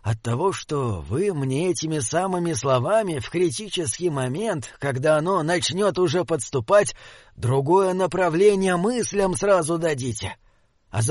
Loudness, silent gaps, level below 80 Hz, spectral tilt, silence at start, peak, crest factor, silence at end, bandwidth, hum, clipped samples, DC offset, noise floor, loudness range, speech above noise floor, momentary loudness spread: -22 LUFS; none; -50 dBFS; -5 dB/octave; 0.05 s; -6 dBFS; 16 dB; 0 s; 11.5 kHz; none; under 0.1%; under 0.1%; -54 dBFS; 3 LU; 32 dB; 8 LU